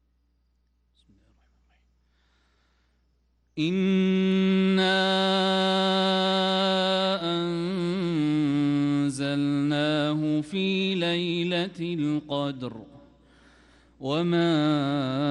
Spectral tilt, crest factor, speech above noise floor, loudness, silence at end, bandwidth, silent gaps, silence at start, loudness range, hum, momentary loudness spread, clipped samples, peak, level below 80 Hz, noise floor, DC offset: -6 dB/octave; 14 dB; 44 dB; -25 LUFS; 0 s; 11 kHz; none; 3.55 s; 7 LU; none; 7 LU; under 0.1%; -12 dBFS; -62 dBFS; -69 dBFS; under 0.1%